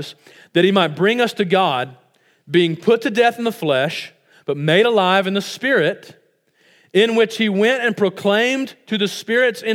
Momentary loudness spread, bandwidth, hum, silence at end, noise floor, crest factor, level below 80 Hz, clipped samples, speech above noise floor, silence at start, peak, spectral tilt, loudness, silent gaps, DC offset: 9 LU; 16.5 kHz; none; 0 s; -59 dBFS; 18 dB; -76 dBFS; under 0.1%; 41 dB; 0 s; 0 dBFS; -5 dB/octave; -17 LUFS; none; under 0.1%